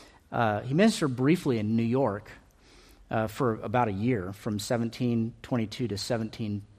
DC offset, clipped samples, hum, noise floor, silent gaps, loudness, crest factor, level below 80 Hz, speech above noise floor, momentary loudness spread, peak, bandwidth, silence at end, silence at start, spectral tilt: under 0.1%; under 0.1%; none; -56 dBFS; none; -28 LUFS; 18 dB; -58 dBFS; 28 dB; 9 LU; -10 dBFS; 15 kHz; 0.1 s; 0 s; -6.5 dB/octave